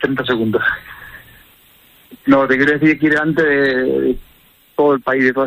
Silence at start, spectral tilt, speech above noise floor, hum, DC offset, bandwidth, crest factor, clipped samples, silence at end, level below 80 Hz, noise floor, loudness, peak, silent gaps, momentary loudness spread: 0 s; -7 dB/octave; 34 dB; none; under 0.1%; 16 kHz; 14 dB; under 0.1%; 0 s; -46 dBFS; -49 dBFS; -15 LUFS; -2 dBFS; none; 13 LU